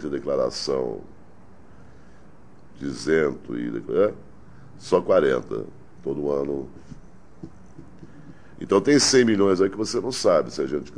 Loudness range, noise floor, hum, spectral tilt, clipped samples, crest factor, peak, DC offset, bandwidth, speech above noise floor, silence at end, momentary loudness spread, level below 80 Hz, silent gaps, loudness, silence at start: 8 LU; -51 dBFS; none; -4 dB/octave; under 0.1%; 20 dB; -4 dBFS; 0.7%; 11 kHz; 28 dB; 0 s; 23 LU; -54 dBFS; none; -23 LUFS; 0 s